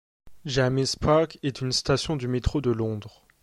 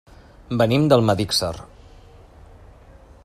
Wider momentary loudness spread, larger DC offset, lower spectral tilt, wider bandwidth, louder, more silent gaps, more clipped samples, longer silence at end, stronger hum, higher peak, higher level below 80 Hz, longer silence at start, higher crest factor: second, 8 LU vs 13 LU; neither; about the same, -5 dB/octave vs -5.5 dB/octave; second, 12.5 kHz vs 14.5 kHz; second, -25 LUFS vs -19 LUFS; neither; neither; second, 0.35 s vs 1.6 s; neither; second, -8 dBFS vs -2 dBFS; about the same, -42 dBFS vs -46 dBFS; second, 0.25 s vs 0.5 s; about the same, 18 dB vs 22 dB